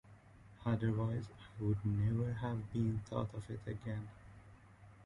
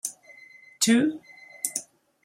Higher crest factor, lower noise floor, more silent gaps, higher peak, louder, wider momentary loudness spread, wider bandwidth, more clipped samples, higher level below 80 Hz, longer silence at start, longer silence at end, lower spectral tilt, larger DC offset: second, 16 dB vs 24 dB; first, -60 dBFS vs -51 dBFS; neither; second, -24 dBFS vs -4 dBFS; second, -39 LUFS vs -25 LUFS; second, 16 LU vs 19 LU; second, 10.5 kHz vs 16 kHz; neither; first, -58 dBFS vs -76 dBFS; about the same, 0.05 s vs 0.05 s; second, 0 s vs 0.4 s; first, -9 dB/octave vs -2.5 dB/octave; neither